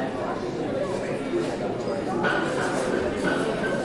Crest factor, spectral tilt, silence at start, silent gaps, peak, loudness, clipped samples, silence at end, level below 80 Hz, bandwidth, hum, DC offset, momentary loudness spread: 16 dB; -5.5 dB/octave; 0 s; none; -10 dBFS; -26 LUFS; under 0.1%; 0 s; -50 dBFS; 11.5 kHz; none; under 0.1%; 4 LU